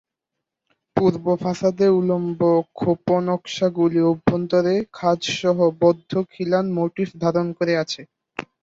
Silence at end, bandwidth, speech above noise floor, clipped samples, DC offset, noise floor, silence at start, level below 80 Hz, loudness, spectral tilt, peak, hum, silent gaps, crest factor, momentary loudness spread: 0.2 s; 7.8 kHz; 63 dB; under 0.1%; under 0.1%; -83 dBFS; 0.95 s; -56 dBFS; -21 LUFS; -6.5 dB/octave; -2 dBFS; none; none; 18 dB; 7 LU